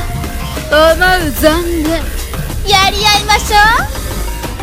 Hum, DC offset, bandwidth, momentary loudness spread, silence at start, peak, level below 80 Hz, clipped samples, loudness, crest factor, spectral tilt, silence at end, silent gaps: none; under 0.1%; 17 kHz; 13 LU; 0 s; 0 dBFS; -20 dBFS; 0.5%; -11 LUFS; 12 dB; -3.5 dB/octave; 0 s; none